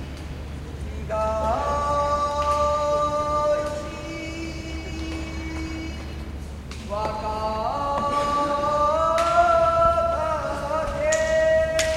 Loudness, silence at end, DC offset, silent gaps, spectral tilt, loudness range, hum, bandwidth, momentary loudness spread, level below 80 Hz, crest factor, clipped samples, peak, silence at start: -23 LUFS; 0 s; under 0.1%; none; -4.5 dB/octave; 10 LU; none; 15 kHz; 15 LU; -36 dBFS; 18 dB; under 0.1%; -4 dBFS; 0 s